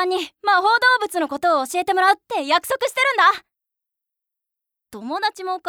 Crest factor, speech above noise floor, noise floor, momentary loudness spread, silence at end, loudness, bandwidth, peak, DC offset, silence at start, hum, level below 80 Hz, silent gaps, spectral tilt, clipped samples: 16 dB; 65 dB; -84 dBFS; 9 LU; 0 s; -19 LUFS; over 20 kHz; -4 dBFS; under 0.1%; 0 s; none; -68 dBFS; none; -1 dB/octave; under 0.1%